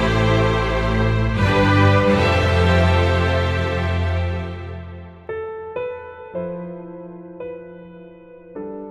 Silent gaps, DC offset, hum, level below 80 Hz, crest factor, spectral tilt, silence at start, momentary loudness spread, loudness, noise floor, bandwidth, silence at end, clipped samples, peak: none; under 0.1%; none; -30 dBFS; 18 dB; -7 dB/octave; 0 s; 20 LU; -19 LUFS; -42 dBFS; 10 kHz; 0 s; under 0.1%; -2 dBFS